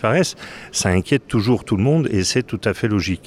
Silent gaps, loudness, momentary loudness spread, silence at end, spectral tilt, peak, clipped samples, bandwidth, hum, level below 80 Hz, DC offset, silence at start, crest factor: none; -19 LUFS; 6 LU; 0.1 s; -5 dB/octave; -4 dBFS; under 0.1%; 14.5 kHz; none; -44 dBFS; under 0.1%; 0 s; 16 dB